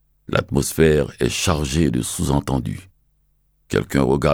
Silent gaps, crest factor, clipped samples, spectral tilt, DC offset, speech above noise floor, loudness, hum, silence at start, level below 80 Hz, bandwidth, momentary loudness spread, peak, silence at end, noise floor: none; 18 dB; under 0.1%; -5.5 dB/octave; under 0.1%; 44 dB; -20 LUFS; none; 0.3 s; -34 dBFS; 20 kHz; 8 LU; -4 dBFS; 0 s; -63 dBFS